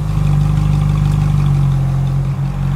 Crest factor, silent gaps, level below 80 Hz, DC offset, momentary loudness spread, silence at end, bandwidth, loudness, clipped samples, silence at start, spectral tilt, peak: 10 dB; none; -22 dBFS; under 0.1%; 3 LU; 0 s; 10.5 kHz; -15 LUFS; under 0.1%; 0 s; -8.5 dB/octave; -4 dBFS